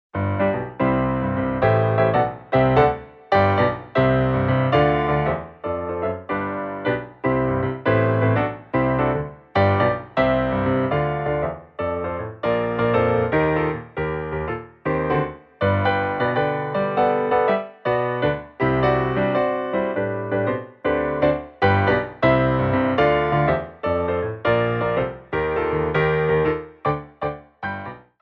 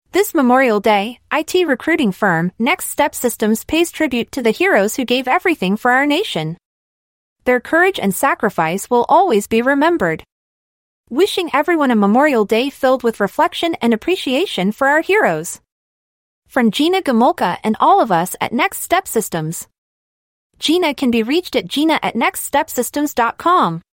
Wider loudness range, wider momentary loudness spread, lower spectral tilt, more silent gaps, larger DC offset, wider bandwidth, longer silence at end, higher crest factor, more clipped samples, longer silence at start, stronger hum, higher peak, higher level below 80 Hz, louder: about the same, 3 LU vs 2 LU; about the same, 8 LU vs 7 LU; first, -9.5 dB/octave vs -4 dB/octave; second, none vs 6.65-7.36 s, 10.32-11.04 s, 15.72-16.42 s, 19.78-20.50 s; neither; second, 5.8 kHz vs 17 kHz; about the same, 0.2 s vs 0.15 s; about the same, 18 dB vs 14 dB; neither; about the same, 0.15 s vs 0.15 s; neither; about the same, -4 dBFS vs -2 dBFS; first, -42 dBFS vs -54 dBFS; second, -21 LUFS vs -16 LUFS